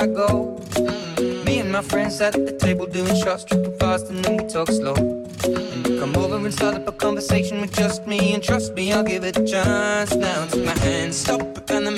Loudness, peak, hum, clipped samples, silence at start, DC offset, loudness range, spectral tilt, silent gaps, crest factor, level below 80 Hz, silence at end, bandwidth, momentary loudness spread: -21 LUFS; -6 dBFS; none; under 0.1%; 0 s; under 0.1%; 2 LU; -5 dB/octave; none; 14 dB; -42 dBFS; 0 s; 16.5 kHz; 4 LU